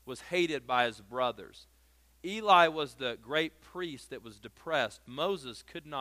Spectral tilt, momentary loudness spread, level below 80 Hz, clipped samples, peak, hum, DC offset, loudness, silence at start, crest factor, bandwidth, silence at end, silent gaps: -4 dB/octave; 21 LU; -66 dBFS; under 0.1%; -8 dBFS; none; under 0.1%; -31 LUFS; 0.05 s; 24 dB; 15.5 kHz; 0 s; none